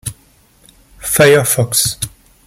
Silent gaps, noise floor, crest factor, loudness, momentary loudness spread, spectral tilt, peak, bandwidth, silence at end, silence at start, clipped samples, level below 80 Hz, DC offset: none; -50 dBFS; 16 dB; -12 LUFS; 17 LU; -3 dB/octave; 0 dBFS; 17 kHz; 0.4 s; 0.05 s; under 0.1%; -44 dBFS; under 0.1%